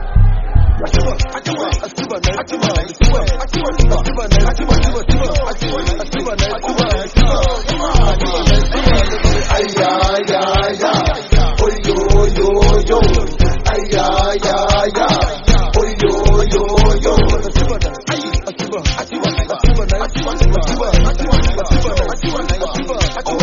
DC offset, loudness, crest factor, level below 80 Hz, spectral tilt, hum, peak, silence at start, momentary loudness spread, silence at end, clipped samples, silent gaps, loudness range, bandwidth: under 0.1%; -15 LUFS; 12 dB; -14 dBFS; -5 dB/octave; none; 0 dBFS; 0 s; 6 LU; 0 s; under 0.1%; none; 3 LU; 7.4 kHz